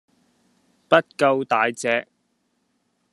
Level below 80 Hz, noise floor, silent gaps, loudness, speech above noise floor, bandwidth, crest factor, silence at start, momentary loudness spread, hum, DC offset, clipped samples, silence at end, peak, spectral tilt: -72 dBFS; -70 dBFS; none; -21 LUFS; 50 dB; 12.5 kHz; 24 dB; 0.9 s; 5 LU; none; under 0.1%; under 0.1%; 1.1 s; 0 dBFS; -4 dB/octave